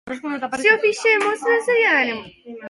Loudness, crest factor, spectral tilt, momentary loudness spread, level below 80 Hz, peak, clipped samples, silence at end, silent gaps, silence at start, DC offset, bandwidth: -18 LUFS; 18 dB; -2.5 dB/octave; 12 LU; -64 dBFS; -2 dBFS; under 0.1%; 0 s; none; 0.05 s; under 0.1%; 11.5 kHz